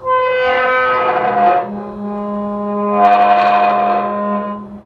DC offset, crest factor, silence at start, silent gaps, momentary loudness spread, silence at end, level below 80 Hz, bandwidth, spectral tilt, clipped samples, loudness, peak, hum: under 0.1%; 14 dB; 0 s; none; 12 LU; 0.05 s; -52 dBFS; 5.8 kHz; -7 dB/octave; under 0.1%; -14 LUFS; -2 dBFS; none